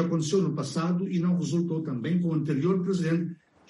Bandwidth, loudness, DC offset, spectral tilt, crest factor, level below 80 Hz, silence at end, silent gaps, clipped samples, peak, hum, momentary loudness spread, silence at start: 11.5 kHz; -27 LUFS; under 0.1%; -7 dB/octave; 12 dB; -68 dBFS; 0.35 s; none; under 0.1%; -14 dBFS; none; 4 LU; 0 s